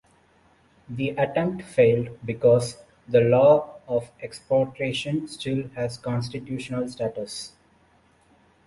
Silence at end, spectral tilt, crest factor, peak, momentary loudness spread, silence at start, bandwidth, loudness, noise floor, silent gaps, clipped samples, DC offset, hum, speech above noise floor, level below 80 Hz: 1.2 s; -6.5 dB/octave; 18 dB; -6 dBFS; 15 LU; 0.9 s; 11.5 kHz; -24 LUFS; -60 dBFS; none; under 0.1%; under 0.1%; none; 37 dB; -58 dBFS